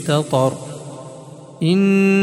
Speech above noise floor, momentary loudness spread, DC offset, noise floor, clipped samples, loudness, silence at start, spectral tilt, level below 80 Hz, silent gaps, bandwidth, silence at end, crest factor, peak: 22 dB; 22 LU; under 0.1%; -37 dBFS; under 0.1%; -17 LUFS; 0 s; -6.5 dB/octave; -60 dBFS; none; 12.5 kHz; 0 s; 14 dB; -4 dBFS